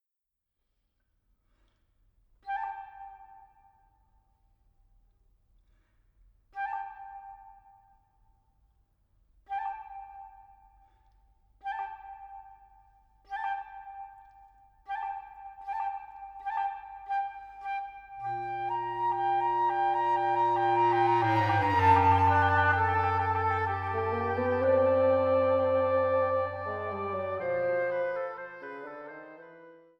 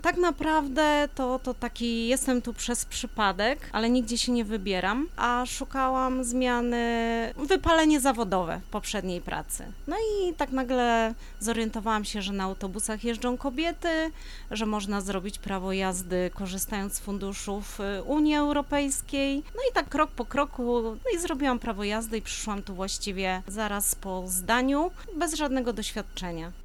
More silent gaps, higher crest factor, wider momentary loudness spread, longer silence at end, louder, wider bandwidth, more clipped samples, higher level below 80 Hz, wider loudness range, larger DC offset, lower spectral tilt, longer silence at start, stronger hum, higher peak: neither; about the same, 20 dB vs 18 dB; first, 22 LU vs 9 LU; first, 0.3 s vs 0 s; about the same, -28 LUFS vs -28 LUFS; second, 7 kHz vs 19.5 kHz; neither; second, -64 dBFS vs -42 dBFS; first, 19 LU vs 4 LU; neither; first, -7.5 dB/octave vs -3.5 dB/octave; first, 2.45 s vs 0 s; neither; about the same, -12 dBFS vs -10 dBFS